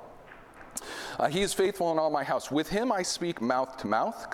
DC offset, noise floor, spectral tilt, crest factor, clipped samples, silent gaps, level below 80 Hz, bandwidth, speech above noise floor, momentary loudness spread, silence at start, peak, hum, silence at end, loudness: under 0.1%; -50 dBFS; -4 dB/octave; 20 dB; under 0.1%; none; -56 dBFS; 17.5 kHz; 21 dB; 12 LU; 0 s; -10 dBFS; none; 0 s; -29 LUFS